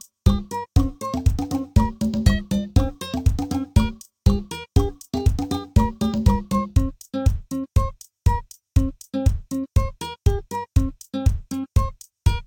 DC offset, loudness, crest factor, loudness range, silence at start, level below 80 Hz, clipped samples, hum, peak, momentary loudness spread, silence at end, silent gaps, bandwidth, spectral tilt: under 0.1%; -23 LUFS; 18 dB; 2 LU; 0.25 s; -26 dBFS; under 0.1%; none; -4 dBFS; 6 LU; 0.05 s; none; 17.5 kHz; -7 dB/octave